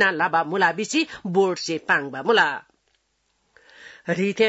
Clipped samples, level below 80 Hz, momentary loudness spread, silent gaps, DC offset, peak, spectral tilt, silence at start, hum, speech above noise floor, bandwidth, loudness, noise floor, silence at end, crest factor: under 0.1%; -68 dBFS; 8 LU; none; under 0.1%; -6 dBFS; -4 dB/octave; 0 s; none; 49 dB; 8 kHz; -22 LUFS; -70 dBFS; 0 s; 18 dB